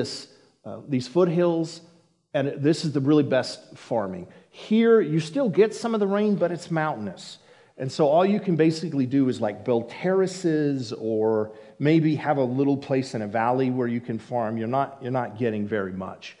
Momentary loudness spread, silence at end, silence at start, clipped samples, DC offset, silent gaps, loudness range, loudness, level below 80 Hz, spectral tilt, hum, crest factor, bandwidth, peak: 13 LU; 0.1 s; 0 s; under 0.1%; under 0.1%; none; 3 LU; -24 LUFS; -74 dBFS; -7 dB/octave; none; 16 dB; 11 kHz; -8 dBFS